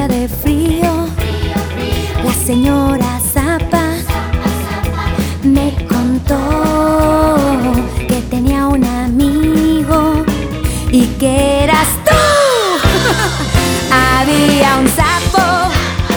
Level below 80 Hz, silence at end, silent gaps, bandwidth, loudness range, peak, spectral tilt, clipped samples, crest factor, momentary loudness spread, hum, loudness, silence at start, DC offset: -22 dBFS; 0 s; none; over 20 kHz; 4 LU; 0 dBFS; -5 dB/octave; under 0.1%; 12 dB; 7 LU; none; -13 LUFS; 0 s; under 0.1%